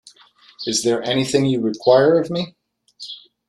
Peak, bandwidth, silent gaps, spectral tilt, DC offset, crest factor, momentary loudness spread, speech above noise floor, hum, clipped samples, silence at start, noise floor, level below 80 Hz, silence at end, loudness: -2 dBFS; 13 kHz; none; -4.5 dB/octave; under 0.1%; 18 dB; 20 LU; 24 dB; none; under 0.1%; 0.6 s; -42 dBFS; -60 dBFS; 0.3 s; -18 LUFS